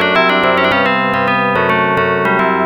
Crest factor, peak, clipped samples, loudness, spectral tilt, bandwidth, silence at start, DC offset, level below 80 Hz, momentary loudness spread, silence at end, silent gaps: 12 dB; -2 dBFS; under 0.1%; -12 LUFS; -6.5 dB/octave; 20 kHz; 0 s; under 0.1%; -52 dBFS; 2 LU; 0 s; none